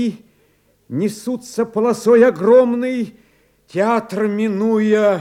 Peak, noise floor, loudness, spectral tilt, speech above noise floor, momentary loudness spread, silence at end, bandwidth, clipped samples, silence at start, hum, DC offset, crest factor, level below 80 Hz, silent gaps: -2 dBFS; -58 dBFS; -17 LUFS; -6.5 dB/octave; 42 dB; 13 LU; 0 s; 15 kHz; under 0.1%; 0 s; none; under 0.1%; 16 dB; -62 dBFS; none